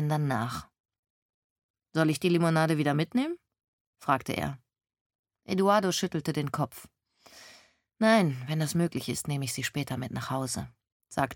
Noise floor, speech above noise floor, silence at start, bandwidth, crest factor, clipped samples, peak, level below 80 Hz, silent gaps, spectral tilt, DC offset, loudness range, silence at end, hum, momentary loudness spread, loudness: -59 dBFS; 31 dB; 0 s; 17.5 kHz; 20 dB; under 0.1%; -10 dBFS; -62 dBFS; 0.80-0.84 s, 0.99-1.03 s, 1.10-1.56 s, 1.63-1.74 s, 3.68-3.93 s, 5.01-5.24 s, 10.92-11.00 s; -5.5 dB/octave; under 0.1%; 2 LU; 0 s; none; 12 LU; -29 LUFS